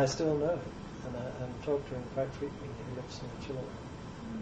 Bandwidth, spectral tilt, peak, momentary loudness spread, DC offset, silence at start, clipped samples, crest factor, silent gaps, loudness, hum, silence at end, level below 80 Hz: 8.8 kHz; -6 dB/octave; -18 dBFS; 13 LU; under 0.1%; 0 s; under 0.1%; 18 dB; none; -37 LUFS; none; 0 s; -54 dBFS